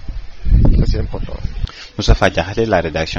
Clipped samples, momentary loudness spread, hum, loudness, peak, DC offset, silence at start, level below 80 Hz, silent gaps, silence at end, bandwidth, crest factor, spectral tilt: under 0.1%; 13 LU; none; -17 LUFS; 0 dBFS; under 0.1%; 0 s; -18 dBFS; none; 0 s; 7.2 kHz; 14 dB; -6 dB/octave